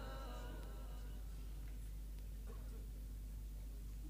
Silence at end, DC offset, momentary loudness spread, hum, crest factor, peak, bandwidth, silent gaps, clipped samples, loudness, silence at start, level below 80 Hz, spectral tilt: 0 s; under 0.1%; 2 LU; 50 Hz at -50 dBFS; 10 dB; -38 dBFS; 15.5 kHz; none; under 0.1%; -52 LUFS; 0 s; -48 dBFS; -5.5 dB/octave